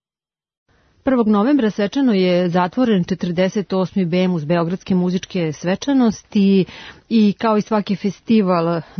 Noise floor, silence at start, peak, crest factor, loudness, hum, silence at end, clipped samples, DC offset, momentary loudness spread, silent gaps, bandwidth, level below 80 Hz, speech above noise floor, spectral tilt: under -90 dBFS; 1.05 s; -6 dBFS; 12 dB; -18 LUFS; none; 0.15 s; under 0.1%; under 0.1%; 6 LU; none; 6.6 kHz; -54 dBFS; over 73 dB; -7 dB/octave